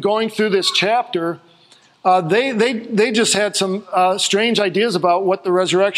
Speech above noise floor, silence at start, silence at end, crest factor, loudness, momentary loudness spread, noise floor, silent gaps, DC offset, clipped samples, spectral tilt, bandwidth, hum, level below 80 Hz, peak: 34 dB; 0 s; 0 s; 16 dB; -17 LUFS; 5 LU; -51 dBFS; none; under 0.1%; under 0.1%; -3.5 dB/octave; 15 kHz; none; -68 dBFS; -2 dBFS